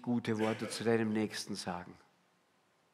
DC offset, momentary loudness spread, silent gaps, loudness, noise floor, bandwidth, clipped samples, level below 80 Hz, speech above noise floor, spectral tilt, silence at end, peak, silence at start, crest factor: under 0.1%; 11 LU; none; -35 LUFS; -73 dBFS; 14.5 kHz; under 0.1%; -78 dBFS; 38 dB; -5 dB/octave; 1 s; -18 dBFS; 0 s; 20 dB